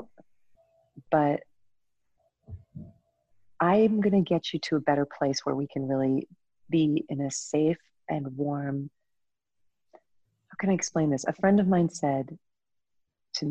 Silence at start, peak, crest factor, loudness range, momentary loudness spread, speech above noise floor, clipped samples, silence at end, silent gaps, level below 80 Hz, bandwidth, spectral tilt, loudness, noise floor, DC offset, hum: 0 s; -10 dBFS; 18 dB; 7 LU; 18 LU; 59 dB; under 0.1%; 0 s; none; -64 dBFS; 9 kHz; -6 dB/octave; -27 LUFS; -85 dBFS; under 0.1%; none